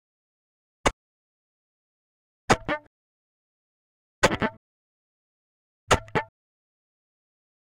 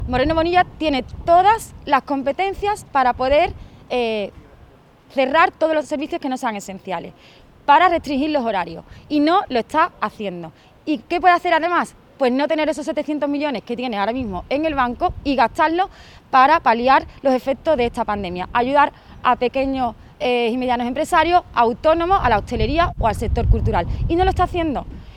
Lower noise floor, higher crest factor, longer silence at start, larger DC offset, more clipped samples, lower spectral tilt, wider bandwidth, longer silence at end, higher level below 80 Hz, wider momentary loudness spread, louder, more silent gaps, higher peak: first, under -90 dBFS vs -48 dBFS; first, 26 dB vs 18 dB; first, 0.85 s vs 0 s; neither; neither; second, -4 dB/octave vs -6 dB/octave; first, 16.5 kHz vs 14.5 kHz; first, 1.45 s vs 0 s; second, -48 dBFS vs -34 dBFS; about the same, 9 LU vs 10 LU; second, -26 LUFS vs -19 LUFS; first, 0.93-2.48 s, 2.87-4.22 s, 4.57-5.87 s vs none; second, -6 dBFS vs -2 dBFS